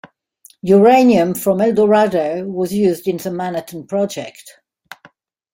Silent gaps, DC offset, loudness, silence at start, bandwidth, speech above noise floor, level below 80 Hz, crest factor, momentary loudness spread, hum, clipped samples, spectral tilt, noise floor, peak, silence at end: none; under 0.1%; -15 LUFS; 0.65 s; 16.5 kHz; 36 dB; -58 dBFS; 16 dB; 14 LU; none; under 0.1%; -6.5 dB/octave; -51 dBFS; -2 dBFS; 1.05 s